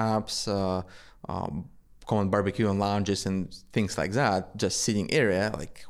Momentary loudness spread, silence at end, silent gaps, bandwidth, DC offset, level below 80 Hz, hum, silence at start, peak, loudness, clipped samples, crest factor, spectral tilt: 10 LU; 0 s; none; 14.5 kHz; under 0.1%; -52 dBFS; none; 0 s; -10 dBFS; -28 LUFS; under 0.1%; 18 dB; -5 dB/octave